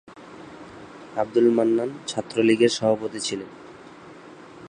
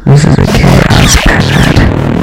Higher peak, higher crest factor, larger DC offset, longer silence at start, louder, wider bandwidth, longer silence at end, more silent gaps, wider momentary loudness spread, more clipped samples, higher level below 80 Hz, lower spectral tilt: second, -6 dBFS vs 0 dBFS; first, 20 dB vs 6 dB; neither; about the same, 0.1 s vs 0 s; second, -23 LUFS vs -6 LUFS; second, 10 kHz vs 16.5 kHz; about the same, 0.05 s vs 0 s; neither; first, 25 LU vs 2 LU; second, under 0.1% vs 8%; second, -66 dBFS vs -14 dBFS; about the same, -4.5 dB/octave vs -5 dB/octave